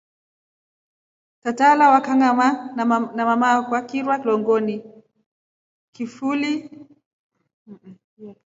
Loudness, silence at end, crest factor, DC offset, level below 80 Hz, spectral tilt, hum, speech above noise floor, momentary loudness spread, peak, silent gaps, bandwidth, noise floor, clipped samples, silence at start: -19 LUFS; 0.15 s; 20 dB; under 0.1%; -74 dBFS; -5 dB/octave; none; over 71 dB; 14 LU; -2 dBFS; 5.26-5.93 s, 7.06-7.30 s, 7.53-7.66 s, 8.04-8.17 s; 7.8 kHz; under -90 dBFS; under 0.1%; 1.45 s